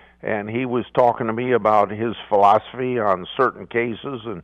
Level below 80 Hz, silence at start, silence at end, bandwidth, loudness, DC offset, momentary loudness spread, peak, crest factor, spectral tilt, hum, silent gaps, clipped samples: -58 dBFS; 0.25 s; 0 s; 8 kHz; -20 LUFS; under 0.1%; 10 LU; -4 dBFS; 18 dB; -7.5 dB/octave; none; none; under 0.1%